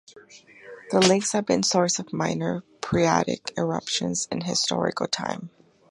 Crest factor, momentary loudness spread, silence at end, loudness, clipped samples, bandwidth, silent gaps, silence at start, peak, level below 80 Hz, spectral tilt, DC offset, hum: 22 dB; 10 LU; 0.4 s; -24 LUFS; under 0.1%; 11.5 kHz; none; 0.15 s; -4 dBFS; -58 dBFS; -3.5 dB/octave; under 0.1%; none